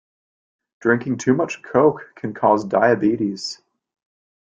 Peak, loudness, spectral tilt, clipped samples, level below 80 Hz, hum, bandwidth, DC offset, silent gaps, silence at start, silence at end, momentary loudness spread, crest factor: -2 dBFS; -19 LUFS; -6 dB/octave; under 0.1%; -62 dBFS; none; 9 kHz; under 0.1%; none; 0.85 s; 0.9 s; 13 LU; 18 dB